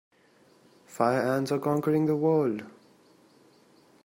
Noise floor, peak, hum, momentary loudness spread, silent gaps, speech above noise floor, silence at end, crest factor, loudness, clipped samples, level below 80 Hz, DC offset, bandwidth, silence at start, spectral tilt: -61 dBFS; -10 dBFS; none; 13 LU; none; 35 dB; 1.35 s; 20 dB; -27 LUFS; under 0.1%; -72 dBFS; under 0.1%; 16 kHz; 0.9 s; -7.5 dB/octave